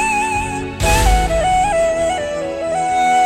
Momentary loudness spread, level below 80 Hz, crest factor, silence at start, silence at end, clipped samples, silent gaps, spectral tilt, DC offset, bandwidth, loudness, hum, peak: 7 LU; -24 dBFS; 14 dB; 0 s; 0 s; under 0.1%; none; -4 dB/octave; under 0.1%; 16 kHz; -17 LUFS; none; -2 dBFS